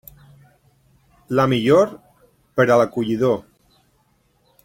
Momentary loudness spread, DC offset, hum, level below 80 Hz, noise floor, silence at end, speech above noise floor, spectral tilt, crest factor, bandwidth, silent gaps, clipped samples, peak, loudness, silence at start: 8 LU; under 0.1%; none; -58 dBFS; -62 dBFS; 1.25 s; 45 dB; -6.5 dB/octave; 18 dB; 16.5 kHz; none; under 0.1%; -2 dBFS; -18 LUFS; 1.3 s